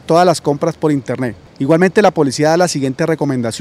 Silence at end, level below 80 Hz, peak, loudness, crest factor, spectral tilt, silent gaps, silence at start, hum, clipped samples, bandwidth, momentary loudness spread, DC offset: 0 s; -52 dBFS; 0 dBFS; -14 LUFS; 14 dB; -5.5 dB/octave; none; 0.1 s; none; under 0.1%; 15.5 kHz; 9 LU; under 0.1%